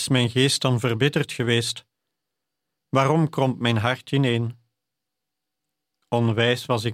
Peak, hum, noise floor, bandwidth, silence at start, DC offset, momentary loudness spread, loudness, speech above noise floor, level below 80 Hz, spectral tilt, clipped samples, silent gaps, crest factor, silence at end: -4 dBFS; none; -84 dBFS; 15 kHz; 0 s; under 0.1%; 6 LU; -22 LUFS; 63 dB; -62 dBFS; -5 dB/octave; under 0.1%; none; 20 dB; 0 s